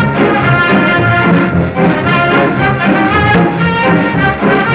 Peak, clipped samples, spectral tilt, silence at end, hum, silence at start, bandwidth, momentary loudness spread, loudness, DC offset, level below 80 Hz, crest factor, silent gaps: 0 dBFS; under 0.1%; -10.5 dB/octave; 0 s; none; 0 s; 4 kHz; 2 LU; -10 LUFS; under 0.1%; -30 dBFS; 10 dB; none